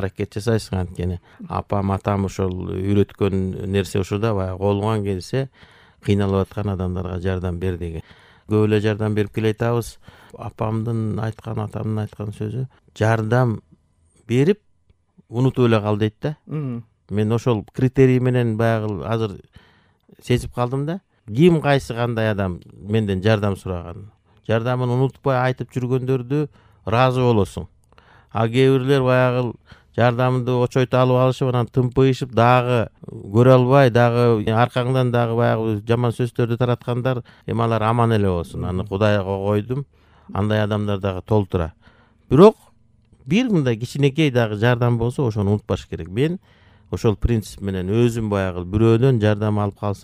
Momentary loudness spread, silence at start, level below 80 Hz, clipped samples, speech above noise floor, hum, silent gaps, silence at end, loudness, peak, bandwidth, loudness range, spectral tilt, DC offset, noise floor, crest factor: 12 LU; 0 s; -44 dBFS; under 0.1%; 42 dB; none; none; 0.05 s; -20 LUFS; 0 dBFS; 13 kHz; 6 LU; -7.5 dB/octave; under 0.1%; -61 dBFS; 20 dB